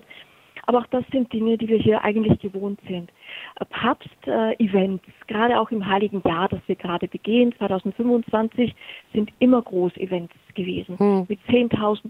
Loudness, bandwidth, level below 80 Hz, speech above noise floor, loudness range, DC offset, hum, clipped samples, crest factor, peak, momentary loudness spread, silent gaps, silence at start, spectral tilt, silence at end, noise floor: -22 LUFS; 4.9 kHz; -54 dBFS; 26 dB; 2 LU; under 0.1%; none; under 0.1%; 18 dB; -4 dBFS; 12 LU; none; 0.2 s; -8.5 dB/octave; 0 s; -48 dBFS